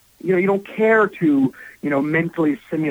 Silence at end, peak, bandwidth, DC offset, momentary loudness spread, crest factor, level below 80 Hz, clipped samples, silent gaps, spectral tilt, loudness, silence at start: 0 s; -8 dBFS; 16.5 kHz; under 0.1%; 7 LU; 12 dB; -62 dBFS; under 0.1%; none; -8.5 dB/octave; -19 LUFS; 0.25 s